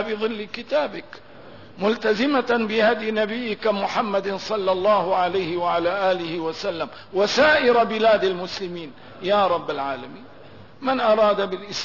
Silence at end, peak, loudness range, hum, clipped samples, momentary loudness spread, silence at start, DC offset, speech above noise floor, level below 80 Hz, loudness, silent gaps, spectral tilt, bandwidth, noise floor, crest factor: 0 s; -8 dBFS; 3 LU; none; under 0.1%; 12 LU; 0 s; 0.4%; 24 dB; -60 dBFS; -22 LUFS; none; -4.5 dB/octave; 6 kHz; -45 dBFS; 14 dB